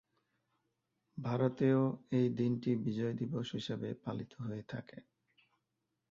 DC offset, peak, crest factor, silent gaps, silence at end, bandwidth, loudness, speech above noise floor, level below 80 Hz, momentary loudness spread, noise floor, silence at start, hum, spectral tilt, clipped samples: under 0.1%; -18 dBFS; 18 dB; none; 1.1 s; 7.4 kHz; -36 LUFS; 50 dB; -74 dBFS; 13 LU; -86 dBFS; 1.15 s; none; -8 dB/octave; under 0.1%